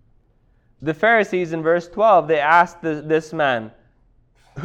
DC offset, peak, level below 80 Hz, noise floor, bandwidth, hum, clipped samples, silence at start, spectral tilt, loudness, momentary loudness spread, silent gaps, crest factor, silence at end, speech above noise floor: under 0.1%; -2 dBFS; -56 dBFS; -58 dBFS; 9 kHz; none; under 0.1%; 0.8 s; -6 dB/octave; -18 LUFS; 12 LU; none; 18 dB; 0 s; 40 dB